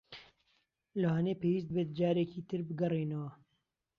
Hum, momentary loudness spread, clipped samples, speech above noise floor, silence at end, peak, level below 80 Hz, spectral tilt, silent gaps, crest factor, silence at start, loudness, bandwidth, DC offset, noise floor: none; 12 LU; under 0.1%; 49 dB; 0.65 s; -20 dBFS; -72 dBFS; -9.5 dB/octave; none; 16 dB; 0.1 s; -35 LUFS; 6.4 kHz; under 0.1%; -82 dBFS